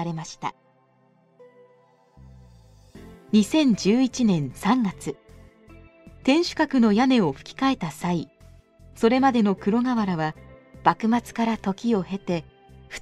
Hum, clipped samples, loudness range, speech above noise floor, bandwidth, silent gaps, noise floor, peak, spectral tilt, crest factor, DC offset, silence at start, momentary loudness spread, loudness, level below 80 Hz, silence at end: none; under 0.1%; 3 LU; 39 dB; 12.5 kHz; none; -61 dBFS; -2 dBFS; -6 dB/octave; 22 dB; under 0.1%; 0 s; 12 LU; -23 LUFS; -54 dBFS; 0 s